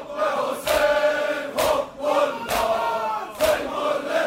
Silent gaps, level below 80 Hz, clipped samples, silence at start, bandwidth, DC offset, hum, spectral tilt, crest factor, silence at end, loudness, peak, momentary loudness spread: none; -50 dBFS; under 0.1%; 0 s; 16 kHz; under 0.1%; none; -2.5 dB/octave; 14 dB; 0 s; -23 LUFS; -8 dBFS; 5 LU